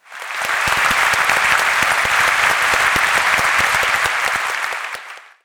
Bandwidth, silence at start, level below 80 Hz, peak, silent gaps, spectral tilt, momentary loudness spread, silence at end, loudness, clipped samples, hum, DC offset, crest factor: over 20 kHz; 0.1 s; -46 dBFS; -2 dBFS; none; -0.5 dB/octave; 9 LU; 0.25 s; -15 LUFS; under 0.1%; none; under 0.1%; 16 dB